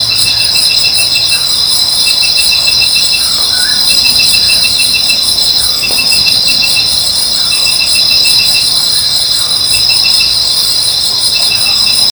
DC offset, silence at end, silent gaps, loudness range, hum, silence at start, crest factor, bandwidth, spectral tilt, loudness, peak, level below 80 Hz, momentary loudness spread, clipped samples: under 0.1%; 0 s; none; 1 LU; none; 0 s; 8 dB; over 20 kHz; 1 dB/octave; -5 LUFS; 0 dBFS; -38 dBFS; 3 LU; 0.6%